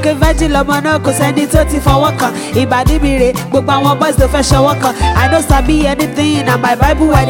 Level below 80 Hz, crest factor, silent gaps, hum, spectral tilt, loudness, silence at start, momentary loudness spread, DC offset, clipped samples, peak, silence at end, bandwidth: -18 dBFS; 10 dB; none; none; -5.5 dB/octave; -11 LUFS; 0 s; 3 LU; under 0.1%; 0.3%; 0 dBFS; 0 s; 18.5 kHz